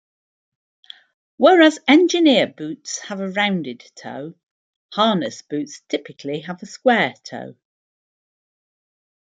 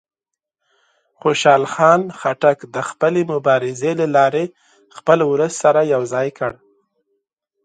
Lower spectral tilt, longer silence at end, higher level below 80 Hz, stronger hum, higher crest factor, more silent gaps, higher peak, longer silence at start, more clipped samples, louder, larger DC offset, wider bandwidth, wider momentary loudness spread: about the same, -4 dB/octave vs -5 dB/octave; first, 1.75 s vs 1.15 s; second, -72 dBFS vs -64 dBFS; neither; about the same, 20 dB vs 18 dB; first, 4.43-4.89 s vs none; about the same, -2 dBFS vs 0 dBFS; first, 1.4 s vs 1.25 s; neither; about the same, -18 LUFS vs -17 LUFS; neither; about the same, 9 kHz vs 9.4 kHz; first, 21 LU vs 10 LU